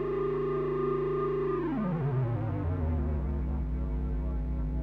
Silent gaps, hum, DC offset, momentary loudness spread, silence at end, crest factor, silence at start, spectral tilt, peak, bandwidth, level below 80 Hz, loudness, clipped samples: none; none; under 0.1%; 4 LU; 0 s; 10 dB; 0 s; -11 dB/octave; -20 dBFS; 4.4 kHz; -36 dBFS; -32 LUFS; under 0.1%